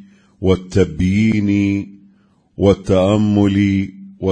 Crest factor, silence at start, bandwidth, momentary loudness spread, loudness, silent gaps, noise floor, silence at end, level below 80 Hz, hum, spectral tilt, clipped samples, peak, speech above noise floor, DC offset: 16 dB; 0.4 s; 9.4 kHz; 9 LU; -16 LUFS; none; -54 dBFS; 0 s; -40 dBFS; none; -7.5 dB/octave; under 0.1%; 0 dBFS; 39 dB; under 0.1%